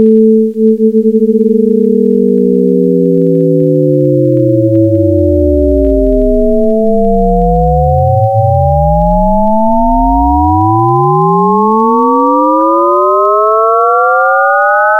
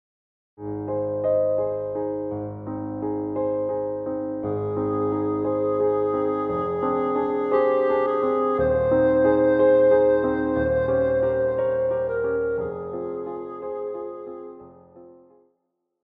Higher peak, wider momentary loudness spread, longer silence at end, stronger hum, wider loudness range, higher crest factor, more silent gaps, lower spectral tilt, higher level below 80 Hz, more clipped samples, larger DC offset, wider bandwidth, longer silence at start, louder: first, 0 dBFS vs -8 dBFS; second, 2 LU vs 13 LU; second, 0 s vs 0.95 s; neither; second, 1 LU vs 8 LU; second, 8 dB vs 16 dB; neither; about the same, -11 dB/octave vs -10.5 dB/octave; first, -20 dBFS vs -50 dBFS; first, 0.3% vs under 0.1%; neither; second, 3.5 kHz vs 4 kHz; second, 0 s vs 0.6 s; first, -9 LUFS vs -23 LUFS